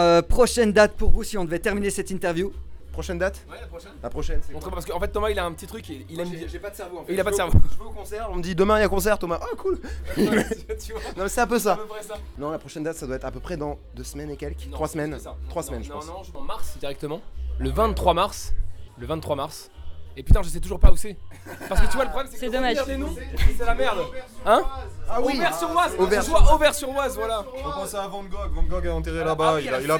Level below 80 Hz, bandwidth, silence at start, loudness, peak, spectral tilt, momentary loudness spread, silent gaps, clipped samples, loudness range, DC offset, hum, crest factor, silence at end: -28 dBFS; 17.5 kHz; 0 s; -25 LUFS; -2 dBFS; -5 dB/octave; 16 LU; none; under 0.1%; 9 LU; under 0.1%; none; 20 dB; 0 s